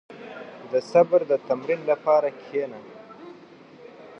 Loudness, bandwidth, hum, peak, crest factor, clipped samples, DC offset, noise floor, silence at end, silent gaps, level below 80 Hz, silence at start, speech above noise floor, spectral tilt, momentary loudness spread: -23 LUFS; 7.8 kHz; none; -6 dBFS; 20 dB; under 0.1%; under 0.1%; -48 dBFS; 0.9 s; none; -80 dBFS; 0.1 s; 25 dB; -6.5 dB/octave; 24 LU